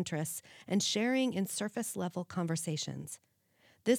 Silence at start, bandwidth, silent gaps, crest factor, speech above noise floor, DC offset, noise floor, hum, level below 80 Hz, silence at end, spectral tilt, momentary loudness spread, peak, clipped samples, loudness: 0 s; 19 kHz; none; 18 dB; 34 dB; under 0.1%; -69 dBFS; none; -80 dBFS; 0 s; -4 dB/octave; 13 LU; -16 dBFS; under 0.1%; -35 LUFS